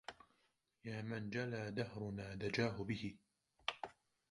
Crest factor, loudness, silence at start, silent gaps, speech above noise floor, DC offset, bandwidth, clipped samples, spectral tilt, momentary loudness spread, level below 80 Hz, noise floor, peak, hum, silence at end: 22 dB; -44 LUFS; 0.1 s; none; 38 dB; under 0.1%; 11.5 kHz; under 0.1%; -6 dB/octave; 13 LU; -70 dBFS; -81 dBFS; -22 dBFS; none; 0.4 s